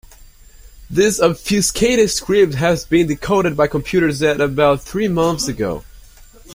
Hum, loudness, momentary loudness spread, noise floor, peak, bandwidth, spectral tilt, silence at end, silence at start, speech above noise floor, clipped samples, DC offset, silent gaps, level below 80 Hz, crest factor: none; -16 LUFS; 6 LU; -43 dBFS; -2 dBFS; 16.5 kHz; -4.5 dB/octave; 0 s; 0.75 s; 27 dB; under 0.1%; under 0.1%; none; -38 dBFS; 16 dB